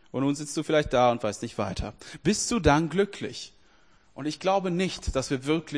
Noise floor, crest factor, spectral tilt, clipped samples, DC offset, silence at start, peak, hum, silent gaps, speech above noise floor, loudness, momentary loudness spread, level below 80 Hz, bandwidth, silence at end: -61 dBFS; 20 dB; -5 dB/octave; under 0.1%; under 0.1%; 0.15 s; -6 dBFS; none; none; 34 dB; -27 LUFS; 13 LU; -44 dBFS; 10.5 kHz; 0 s